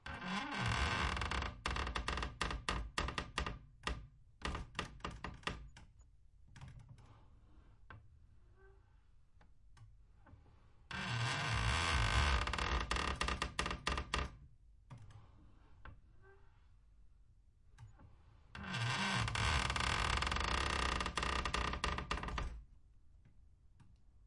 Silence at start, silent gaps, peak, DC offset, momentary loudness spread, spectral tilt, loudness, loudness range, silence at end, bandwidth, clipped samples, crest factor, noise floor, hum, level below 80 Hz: 0.05 s; none; -18 dBFS; under 0.1%; 23 LU; -3.5 dB/octave; -39 LUFS; 13 LU; 0.1 s; 11.5 kHz; under 0.1%; 22 dB; -65 dBFS; none; -48 dBFS